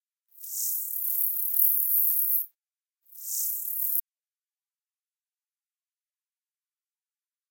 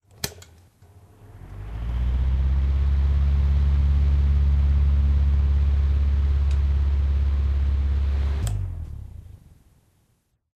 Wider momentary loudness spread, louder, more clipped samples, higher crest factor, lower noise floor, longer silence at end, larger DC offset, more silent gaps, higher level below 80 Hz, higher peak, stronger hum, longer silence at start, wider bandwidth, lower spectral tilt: about the same, 13 LU vs 12 LU; about the same, -24 LUFS vs -23 LUFS; neither; first, 26 dB vs 16 dB; first, under -90 dBFS vs -68 dBFS; first, 3.5 s vs 1.25 s; neither; neither; second, under -90 dBFS vs -22 dBFS; about the same, -6 dBFS vs -6 dBFS; neither; about the same, 0.35 s vs 0.25 s; first, 18 kHz vs 13 kHz; second, 7.5 dB/octave vs -7 dB/octave